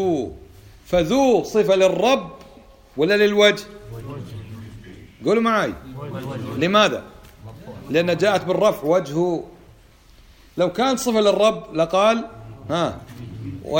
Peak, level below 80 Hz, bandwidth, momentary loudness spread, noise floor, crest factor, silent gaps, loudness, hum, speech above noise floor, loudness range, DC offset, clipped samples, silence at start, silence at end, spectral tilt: 0 dBFS; -48 dBFS; 17 kHz; 20 LU; -49 dBFS; 20 dB; none; -19 LUFS; none; 30 dB; 4 LU; under 0.1%; under 0.1%; 0 s; 0 s; -5 dB/octave